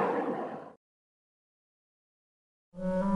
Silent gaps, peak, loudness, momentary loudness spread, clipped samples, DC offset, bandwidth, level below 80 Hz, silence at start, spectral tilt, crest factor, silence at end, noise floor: 0.77-2.72 s; -18 dBFS; -35 LUFS; 21 LU; under 0.1%; under 0.1%; 10.5 kHz; -58 dBFS; 0 s; -8.5 dB/octave; 18 dB; 0 s; under -90 dBFS